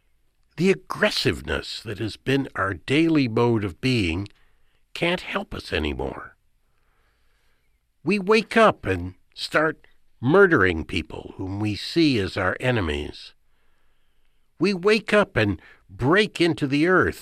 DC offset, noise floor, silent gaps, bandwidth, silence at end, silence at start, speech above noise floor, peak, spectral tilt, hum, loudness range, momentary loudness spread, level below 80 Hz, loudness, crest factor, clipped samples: under 0.1%; -65 dBFS; none; 14.5 kHz; 0 s; 0.55 s; 43 dB; -4 dBFS; -6 dB/octave; none; 7 LU; 13 LU; -44 dBFS; -22 LUFS; 20 dB; under 0.1%